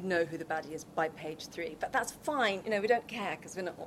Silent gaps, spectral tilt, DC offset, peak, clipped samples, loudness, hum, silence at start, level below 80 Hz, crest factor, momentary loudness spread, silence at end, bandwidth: none; -4 dB/octave; under 0.1%; -14 dBFS; under 0.1%; -34 LUFS; none; 0 s; -68 dBFS; 20 dB; 10 LU; 0 s; 16 kHz